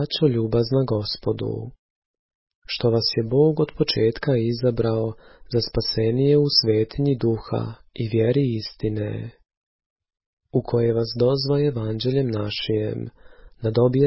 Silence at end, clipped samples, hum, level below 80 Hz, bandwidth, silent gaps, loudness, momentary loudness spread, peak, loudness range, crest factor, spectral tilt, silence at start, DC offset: 0 s; under 0.1%; none; -46 dBFS; 5.8 kHz; 1.79-2.29 s, 2.35-2.47 s, 2.55-2.62 s, 9.57-9.79 s, 9.86-9.96 s, 10.26-10.37 s; -22 LUFS; 11 LU; -4 dBFS; 4 LU; 18 dB; -10 dB/octave; 0 s; under 0.1%